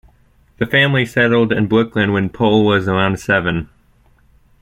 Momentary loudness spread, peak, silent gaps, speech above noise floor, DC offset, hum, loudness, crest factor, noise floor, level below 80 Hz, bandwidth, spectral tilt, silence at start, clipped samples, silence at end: 7 LU; 0 dBFS; none; 38 dB; under 0.1%; none; -15 LUFS; 16 dB; -53 dBFS; -44 dBFS; 14.5 kHz; -6.5 dB/octave; 0.6 s; under 0.1%; 0.95 s